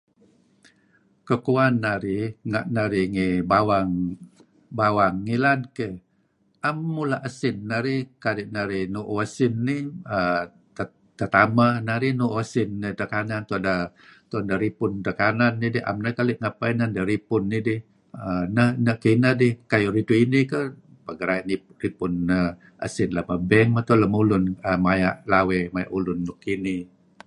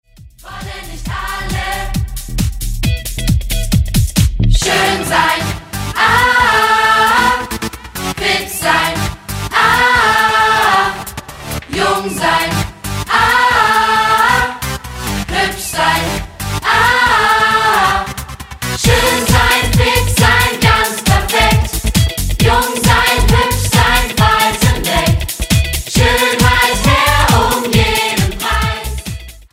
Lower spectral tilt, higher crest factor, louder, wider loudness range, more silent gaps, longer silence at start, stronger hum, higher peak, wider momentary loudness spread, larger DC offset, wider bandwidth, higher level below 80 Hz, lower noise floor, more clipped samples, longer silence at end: first, -7.5 dB/octave vs -3.5 dB/octave; first, 22 dB vs 14 dB; second, -23 LUFS vs -12 LUFS; about the same, 5 LU vs 3 LU; neither; first, 1.25 s vs 0.2 s; neither; about the same, -2 dBFS vs 0 dBFS; about the same, 11 LU vs 12 LU; neither; second, 11.5 kHz vs 16.5 kHz; second, -50 dBFS vs -22 dBFS; first, -66 dBFS vs -36 dBFS; neither; first, 0.4 s vs 0.1 s